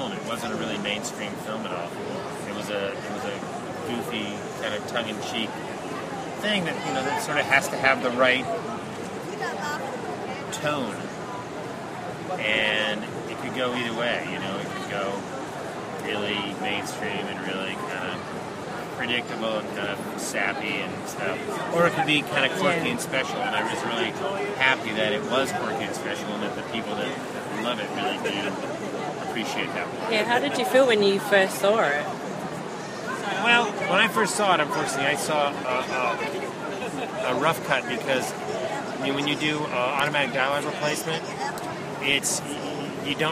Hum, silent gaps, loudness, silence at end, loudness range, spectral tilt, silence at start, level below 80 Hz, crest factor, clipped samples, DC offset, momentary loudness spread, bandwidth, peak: none; none; -26 LUFS; 0 s; 7 LU; -3.5 dB/octave; 0 s; -64 dBFS; 22 dB; under 0.1%; under 0.1%; 11 LU; 15.5 kHz; -4 dBFS